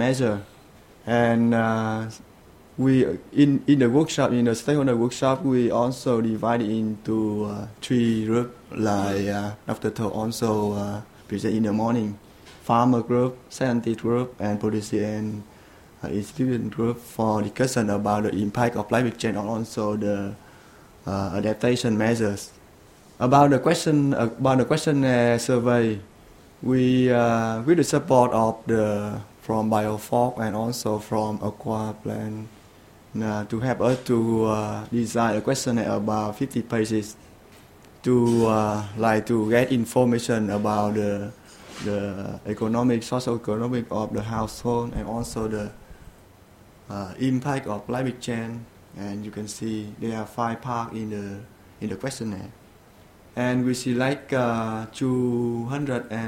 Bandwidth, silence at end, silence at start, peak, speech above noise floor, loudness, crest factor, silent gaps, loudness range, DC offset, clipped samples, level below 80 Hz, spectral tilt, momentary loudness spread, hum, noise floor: 16 kHz; 0 s; 0 s; -4 dBFS; 28 dB; -24 LUFS; 20 dB; none; 8 LU; under 0.1%; under 0.1%; -52 dBFS; -6.5 dB/octave; 12 LU; none; -51 dBFS